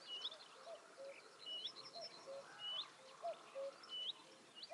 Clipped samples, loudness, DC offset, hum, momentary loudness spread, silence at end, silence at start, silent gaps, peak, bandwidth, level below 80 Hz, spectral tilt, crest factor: under 0.1%; -50 LUFS; under 0.1%; none; 10 LU; 0 s; 0 s; none; -36 dBFS; 11.5 kHz; under -90 dBFS; -1 dB/octave; 16 dB